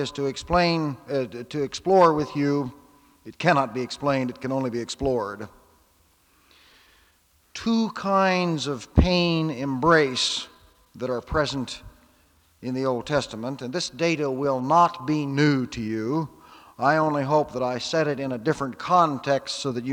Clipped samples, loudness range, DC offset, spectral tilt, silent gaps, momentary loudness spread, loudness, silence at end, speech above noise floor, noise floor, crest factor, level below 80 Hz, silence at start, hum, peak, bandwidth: under 0.1%; 7 LU; under 0.1%; -5.5 dB/octave; none; 11 LU; -24 LUFS; 0 s; 39 dB; -62 dBFS; 22 dB; -42 dBFS; 0 s; none; -2 dBFS; 19 kHz